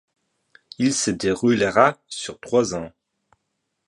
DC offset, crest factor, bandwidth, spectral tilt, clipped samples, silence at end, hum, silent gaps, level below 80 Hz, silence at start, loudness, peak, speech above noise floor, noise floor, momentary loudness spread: under 0.1%; 22 dB; 11.5 kHz; -4 dB/octave; under 0.1%; 1 s; none; none; -56 dBFS; 0.8 s; -21 LUFS; -2 dBFS; 56 dB; -76 dBFS; 14 LU